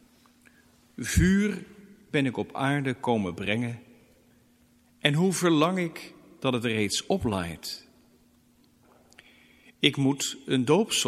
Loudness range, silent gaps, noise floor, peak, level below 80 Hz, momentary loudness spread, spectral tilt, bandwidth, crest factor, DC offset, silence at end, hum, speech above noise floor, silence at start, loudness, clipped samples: 4 LU; none; -62 dBFS; -4 dBFS; -46 dBFS; 14 LU; -4.5 dB/octave; 15.5 kHz; 24 dB; under 0.1%; 0 s; none; 36 dB; 1 s; -27 LUFS; under 0.1%